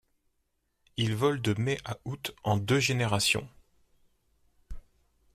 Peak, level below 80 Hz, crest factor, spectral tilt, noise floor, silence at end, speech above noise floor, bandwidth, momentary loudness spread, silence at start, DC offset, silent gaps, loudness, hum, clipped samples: -12 dBFS; -56 dBFS; 20 dB; -4.5 dB/octave; -77 dBFS; 0.55 s; 48 dB; 15.5 kHz; 11 LU; 0.95 s; under 0.1%; none; -29 LUFS; none; under 0.1%